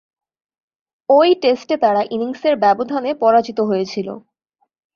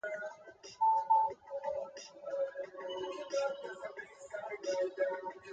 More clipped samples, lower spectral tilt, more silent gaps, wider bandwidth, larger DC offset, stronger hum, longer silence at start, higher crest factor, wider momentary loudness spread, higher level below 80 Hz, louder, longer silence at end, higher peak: neither; first, -6 dB/octave vs -2.5 dB/octave; neither; second, 7 kHz vs 8.8 kHz; neither; neither; first, 1.1 s vs 0.05 s; about the same, 16 dB vs 18 dB; second, 12 LU vs 16 LU; first, -64 dBFS vs -80 dBFS; first, -16 LUFS vs -37 LUFS; first, 0.75 s vs 0 s; first, -2 dBFS vs -20 dBFS